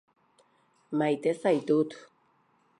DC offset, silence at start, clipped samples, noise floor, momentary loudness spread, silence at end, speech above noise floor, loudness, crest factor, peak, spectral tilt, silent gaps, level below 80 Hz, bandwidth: under 0.1%; 0.9 s; under 0.1%; -68 dBFS; 9 LU; 0.8 s; 41 dB; -28 LUFS; 18 dB; -14 dBFS; -7 dB/octave; none; -84 dBFS; 11 kHz